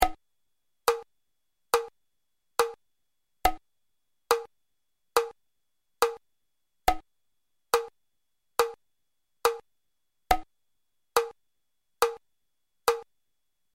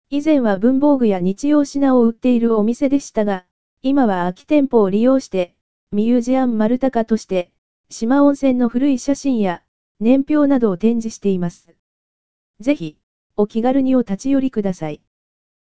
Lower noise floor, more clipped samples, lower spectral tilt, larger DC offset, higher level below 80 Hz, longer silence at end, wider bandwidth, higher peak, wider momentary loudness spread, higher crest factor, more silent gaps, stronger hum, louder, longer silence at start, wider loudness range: second, -83 dBFS vs under -90 dBFS; neither; second, -2 dB/octave vs -7 dB/octave; second, under 0.1% vs 3%; about the same, -50 dBFS vs -50 dBFS; about the same, 0.7 s vs 0.65 s; first, 16.5 kHz vs 8 kHz; second, -6 dBFS vs -2 dBFS; about the same, 10 LU vs 11 LU; first, 28 dB vs 16 dB; second, none vs 3.51-3.77 s, 5.61-5.87 s, 7.58-7.84 s, 9.68-9.95 s, 11.79-12.54 s, 13.03-13.30 s; neither; second, -30 LUFS vs -17 LUFS; about the same, 0 s vs 0.05 s; second, 1 LU vs 4 LU